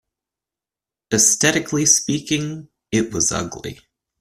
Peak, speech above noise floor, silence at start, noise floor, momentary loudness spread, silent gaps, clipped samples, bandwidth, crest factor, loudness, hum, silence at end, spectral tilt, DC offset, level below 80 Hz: 0 dBFS; 70 dB; 1.1 s; -89 dBFS; 17 LU; none; under 0.1%; 15.5 kHz; 20 dB; -17 LUFS; none; 0.45 s; -2.5 dB/octave; under 0.1%; -52 dBFS